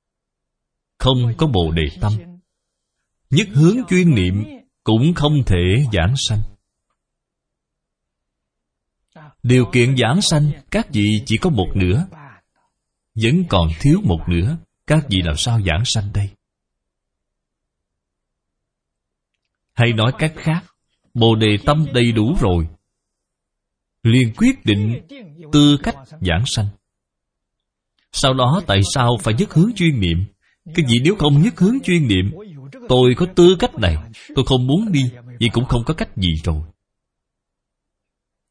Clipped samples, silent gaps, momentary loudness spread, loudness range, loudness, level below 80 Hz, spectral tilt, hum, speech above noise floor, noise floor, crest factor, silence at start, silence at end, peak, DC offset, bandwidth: under 0.1%; none; 10 LU; 6 LU; -17 LUFS; -34 dBFS; -6 dB/octave; none; 64 dB; -79 dBFS; 18 dB; 1 s; 1.85 s; 0 dBFS; under 0.1%; 10.5 kHz